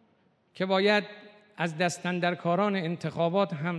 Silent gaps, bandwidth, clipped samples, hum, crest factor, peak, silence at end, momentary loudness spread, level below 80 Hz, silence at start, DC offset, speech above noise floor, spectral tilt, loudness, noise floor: none; 11 kHz; under 0.1%; none; 18 dB; -10 dBFS; 0 s; 9 LU; -80 dBFS; 0.55 s; under 0.1%; 39 dB; -5.5 dB/octave; -28 LUFS; -67 dBFS